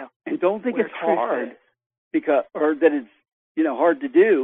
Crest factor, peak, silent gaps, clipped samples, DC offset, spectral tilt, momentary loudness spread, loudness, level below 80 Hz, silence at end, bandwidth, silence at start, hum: 18 dB; -4 dBFS; 0.16-0.20 s, 1.86-1.90 s, 1.98-2.11 s, 3.33-3.55 s; under 0.1%; under 0.1%; -8.5 dB/octave; 10 LU; -22 LUFS; -76 dBFS; 0 s; 3.9 kHz; 0 s; none